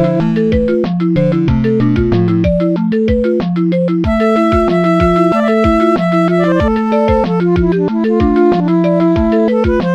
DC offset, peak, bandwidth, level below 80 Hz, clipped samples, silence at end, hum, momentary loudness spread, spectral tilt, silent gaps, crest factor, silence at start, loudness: under 0.1%; 0 dBFS; 8 kHz; -26 dBFS; under 0.1%; 0 s; none; 3 LU; -9 dB/octave; none; 12 dB; 0 s; -12 LUFS